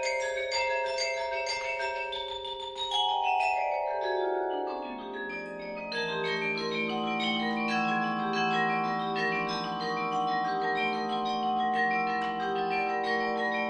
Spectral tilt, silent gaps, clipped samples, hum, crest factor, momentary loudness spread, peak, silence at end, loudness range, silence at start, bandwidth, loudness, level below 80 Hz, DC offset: -3.5 dB/octave; none; under 0.1%; none; 14 dB; 7 LU; -16 dBFS; 0 s; 3 LU; 0 s; 10 kHz; -30 LUFS; -64 dBFS; under 0.1%